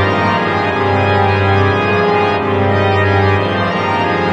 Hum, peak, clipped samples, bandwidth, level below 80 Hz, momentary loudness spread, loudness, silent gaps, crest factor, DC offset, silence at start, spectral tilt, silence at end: none; 0 dBFS; under 0.1%; 7.8 kHz; -46 dBFS; 2 LU; -13 LUFS; none; 12 dB; under 0.1%; 0 s; -7 dB/octave; 0 s